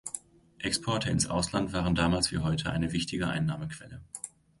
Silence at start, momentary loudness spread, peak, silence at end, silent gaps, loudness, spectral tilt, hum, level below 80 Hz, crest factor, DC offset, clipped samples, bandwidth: 0.05 s; 15 LU; -12 dBFS; 0.3 s; none; -30 LUFS; -4.5 dB/octave; none; -46 dBFS; 18 dB; under 0.1%; under 0.1%; 11.5 kHz